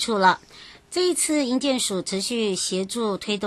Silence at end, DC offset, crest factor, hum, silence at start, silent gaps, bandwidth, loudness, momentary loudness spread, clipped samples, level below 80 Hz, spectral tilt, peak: 0 s; under 0.1%; 18 dB; none; 0 s; none; 12.5 kHz; -23 LUFS; 6 LU; under 0.1%; -62 dBFS; -3 dB/octave; -6 dBFS